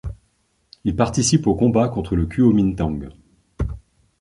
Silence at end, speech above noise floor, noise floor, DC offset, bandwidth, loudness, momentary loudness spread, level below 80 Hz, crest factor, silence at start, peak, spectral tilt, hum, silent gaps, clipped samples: 0.45 s; 47 dB; -65 dBFS; under 0.1%; 11.5 kHz; -20 LUFS; 15 LU; -34 dBFS; 18 dB; 0.05 s; -2 dBFS; -6 dB/octave; none; none; under 0.1%